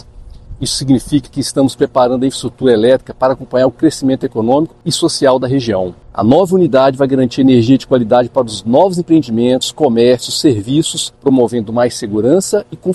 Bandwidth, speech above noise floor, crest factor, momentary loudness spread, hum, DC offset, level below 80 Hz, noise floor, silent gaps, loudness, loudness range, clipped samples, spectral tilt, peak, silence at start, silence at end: 12.5 kHz; 22 dB; 12 dB; 7 LU; none; under 0.1%; -42 dBFS; -34 dBFS; none; -13 LUFS; 2 LU; under 0.1%; -5.5 dB/octave; 0 dBFS; 0.15 s; 0 s